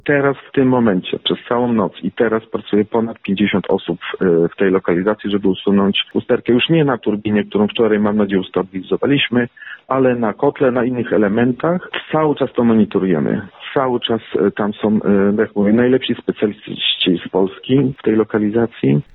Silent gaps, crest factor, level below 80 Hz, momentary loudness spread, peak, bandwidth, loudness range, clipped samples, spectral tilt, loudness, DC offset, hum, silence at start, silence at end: none; 14 dB; -52 dBFS; 6 LU; -2 dBFS; 4.1 kHz; 1 LU; under 0.1%; -10.5 dB/octave; -17 LUFS; under 0.1%; none; 0.05 s; 0.1 s